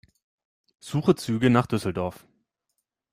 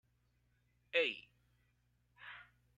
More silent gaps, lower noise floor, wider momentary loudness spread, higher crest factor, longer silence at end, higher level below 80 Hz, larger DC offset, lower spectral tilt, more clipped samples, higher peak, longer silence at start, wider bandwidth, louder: neither; about the same, -80 dBFS vs -77 dBFS; second, 10 LU vs 21 LU; about the same, 22 dB vs 26 dB; first, 1 s vs 0.35 s; first, -58 dBFS vs -80 dBFS; neither; first, -7 dB/octave vs -3 dB/octave; neither; first, -6 dBFS vs -20 dBFS; about the same, 0.85 s vs 0.95 s; first, 15.5 kHz vs 8.8 kHz; first, -25 LUFS vs -37 LUFS